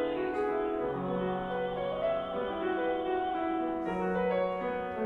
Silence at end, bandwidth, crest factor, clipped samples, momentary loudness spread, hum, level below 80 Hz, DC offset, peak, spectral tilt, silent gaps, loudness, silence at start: 0 s; 6.2 kHz; 12 dB; under 0.1%; 3 LU; none; -56 dBFS; under 0.1%; -20 dBFS; -8 dB/octave; none; -32 LUFS; 0 s